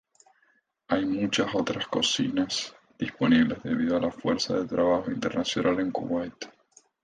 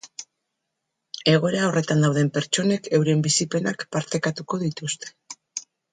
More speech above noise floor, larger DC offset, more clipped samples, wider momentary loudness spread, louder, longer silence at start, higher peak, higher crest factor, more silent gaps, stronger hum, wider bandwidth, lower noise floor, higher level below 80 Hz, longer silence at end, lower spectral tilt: second, 42 dB vs 58 dB; neither; neither; second, 9 LU vs 16 LU; second, -27 LUFS vs -23 LUFS; first, 0.9 s vs 0.05 s; second, -10 dBFS vs -6 dBFS; about the same, 18 dB vs 18 dB; neither; neither; about the same, 9.6 kHz vs 9.6 kHz; second, -69 dBFS vs -80 dBFS; first, -58 dBFS vs -64 dBFS; first, 0.55 s vs 0.3 s; about the same, -4.5 dB/octave vs -4.5 dB/octave